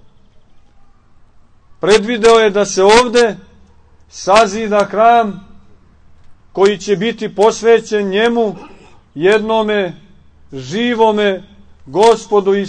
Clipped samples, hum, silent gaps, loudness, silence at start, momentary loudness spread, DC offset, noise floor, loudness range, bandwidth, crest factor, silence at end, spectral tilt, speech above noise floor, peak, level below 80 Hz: under 0.1%; none; none; -13 LUFS; 1.85 s; 14 LU; under 0.1%; -45 dBFS; 4 LU; 9.6 kHz; 14 dB; 0 s; -4 dB/octave; 33 dB; 0 dBFS; -44 dBFS